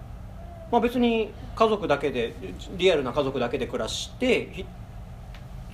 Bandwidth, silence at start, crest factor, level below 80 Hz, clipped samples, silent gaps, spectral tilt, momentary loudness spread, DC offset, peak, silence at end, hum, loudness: 14.5 kHz; 0 s; 22 dB; -44 dBFS; under 0.1%; none; -5 dB/octave; 20 LU; under 0.1%; -6 dBFS; 0 s; none; -25 LUFS